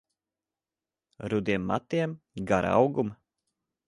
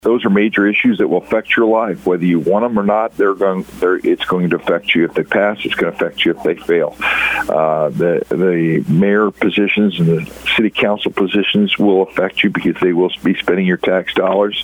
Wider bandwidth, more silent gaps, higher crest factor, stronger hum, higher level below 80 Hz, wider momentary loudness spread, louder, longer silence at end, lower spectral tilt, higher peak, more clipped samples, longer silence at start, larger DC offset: second, 11.5 kHz vs 18 kHz; neither; first, 22 dB vs 14 dB; neither; second, -56 dBFS vs -50 dBFS; first, 11 LU vs 4 LU; second, -28 LUFS vs -15 LUFS; first, 0.75 s vs 0 s; about the same, -7 dB/octave vs -7 dB/octave; second, -8 dBFS vs 0 dBFS; neither; first, 1.2 s vs 0.05 s; neither